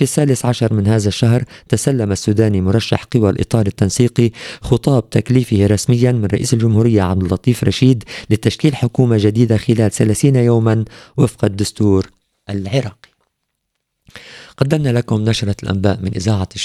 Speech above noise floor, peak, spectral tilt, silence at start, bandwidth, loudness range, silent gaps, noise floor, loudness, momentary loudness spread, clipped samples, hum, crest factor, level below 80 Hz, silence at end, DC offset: 59 dB; 0 dBFS; -6.5 dB/octave; 0 s; 13.5 kHz; 6 LU; none; -73 dBFS; -15 LUFS; 6 LU; under 0.1%; none; 14 dB; -42 dBFS; 0 s; under 0.1%